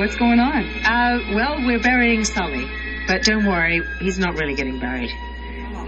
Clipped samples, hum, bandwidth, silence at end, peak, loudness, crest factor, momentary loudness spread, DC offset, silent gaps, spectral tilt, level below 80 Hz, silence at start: under 0.1%; none; 8.8 kHz; 0 s; -2 dBFS; -19 LUFS; 18 dB; 10 LU; under 0.1%; none; -4 dB/octave; -32 dBFS; 0 s